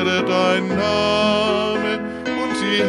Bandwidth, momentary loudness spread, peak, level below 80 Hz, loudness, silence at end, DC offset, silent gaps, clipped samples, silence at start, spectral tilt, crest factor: 11.5 kHz; 6 LU; -4 dBFS; -46 dBFS; -19 LUFS; 0 s; under 0.1%; none; under 0.1%; 0 s; -4.5 dB/octave; 14 dB